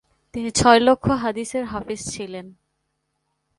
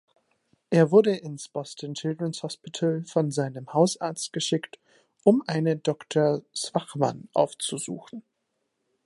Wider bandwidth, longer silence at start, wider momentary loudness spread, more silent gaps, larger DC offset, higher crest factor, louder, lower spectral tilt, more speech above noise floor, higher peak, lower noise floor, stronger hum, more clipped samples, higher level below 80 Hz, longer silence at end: about the same, 11.5 kHz vs 11.5 kHz; second, 0.35 s vs 0.7 s; first, 19 LU vs 13 LU; neither; neither; about the same, 22 dB vs 20 dB; first, -20 LUFS vs -26 LUFS; second, -4 dB/octave vs -5.5 dB/octave; about the same, 54 dB vs 52 dB; first, 0 dBFS vs -6 dBFS; second, -74 dBFS vs -78 dBFS; neither; neither; first, -46 dBFS vs -74 dBFS; first, 1.1 s vs 0.85 s